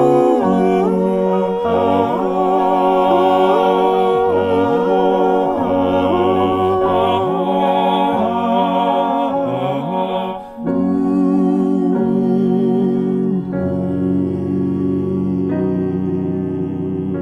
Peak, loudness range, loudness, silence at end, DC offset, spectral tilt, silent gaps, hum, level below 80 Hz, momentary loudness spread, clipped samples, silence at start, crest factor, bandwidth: -2 dBFS; 4 LU; -16 LUFS; 0 s; under 0.1%; -8.5 dB/octave; none; none; -50 dBFS; 6 LU; under 0.1%; 0 s; 14 dB; 11.5 kHz